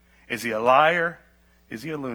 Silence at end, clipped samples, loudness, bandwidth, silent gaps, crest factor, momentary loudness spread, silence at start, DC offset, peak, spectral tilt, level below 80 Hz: 0 s; under 0.1%; -22 LUFS; over 20 kHz; none; 20 dB; 18 LU; 0.3 s; under 0.1%; -4 dBFS; -4.5 dB/octave; -62 dBFS